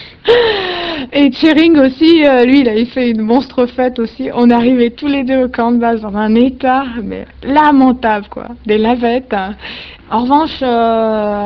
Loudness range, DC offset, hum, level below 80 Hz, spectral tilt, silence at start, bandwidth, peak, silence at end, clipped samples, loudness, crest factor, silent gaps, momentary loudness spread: 4 LU; 0.1%; none; -40 dBFS; -7 dB/octave; 0 s; 6 kHz; 0 dBFS; 0 s; 0.1%; -12 LUFS; 12 dB; none; 11 LU